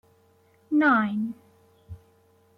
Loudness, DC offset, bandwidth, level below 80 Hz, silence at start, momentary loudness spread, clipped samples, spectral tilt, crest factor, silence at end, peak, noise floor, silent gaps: -24 LUFS; under 0.1%; 5.2 kHz; -62 dBFS; 0.7 s; 15 LU; under 0.1%; -8 dB/octave; 20 dB; 0.6 s; -10 dBFS; -61 dBFS; none